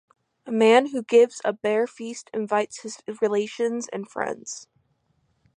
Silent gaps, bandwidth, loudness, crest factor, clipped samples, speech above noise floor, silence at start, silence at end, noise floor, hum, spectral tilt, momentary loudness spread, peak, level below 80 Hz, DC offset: none; 10.5 kHz; -23 LUFS; 20 dB; under 0.1%; 46 dB; 0.45 s; 0.95 s; -69 dBFS; none; -4 dB/octave; 17 LU; -4 dBFS; -76 dBFS; under 0.1%